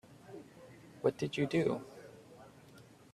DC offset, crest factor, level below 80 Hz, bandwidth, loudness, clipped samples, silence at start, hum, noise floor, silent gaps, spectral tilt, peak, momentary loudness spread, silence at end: under 0.1%; 22 dB; -72 dBFS; 14 kHz; -35 LUFS; under 0.1%; 0.1 s; none; -58 dBFS; none; -6.5 dB/octave; -16 dBFS; 24 LU; 0.3 s